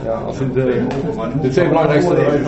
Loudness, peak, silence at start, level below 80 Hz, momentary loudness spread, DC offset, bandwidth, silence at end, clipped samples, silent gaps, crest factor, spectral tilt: -16 LUFS; 0 dBFS; 0 s; -38 dBFS; 7 LU; under 0.1%; 8.2 kHz; 0 s; under 0.1%; none; 16 dB; -8 dB/octave